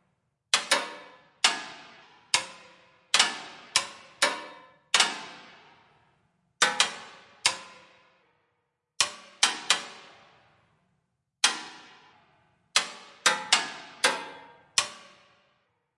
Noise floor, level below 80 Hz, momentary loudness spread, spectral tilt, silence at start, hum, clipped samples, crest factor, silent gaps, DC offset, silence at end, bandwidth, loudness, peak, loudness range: -78 dBFS; -80 dBFS; 20 LU; 1.5 dB/octave; 0.55 s; none; under 0.1%; 28 dB; none; under 0.1%; 1 s; 11.5 kHz; -26 LUFS; -4 dBFS; 3 LU